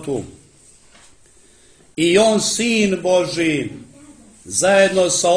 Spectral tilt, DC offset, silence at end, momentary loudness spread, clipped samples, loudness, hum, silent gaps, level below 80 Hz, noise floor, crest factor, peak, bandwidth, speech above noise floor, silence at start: -3 dB/octave; under 0.1%; 0 s; 16 LU; under 0.1%; -16 LUFS; none; none; -54 dBFS; -50 dBFS; 16 dB; -2 dBFS; 10.5 kHz; 33 dB; 0 s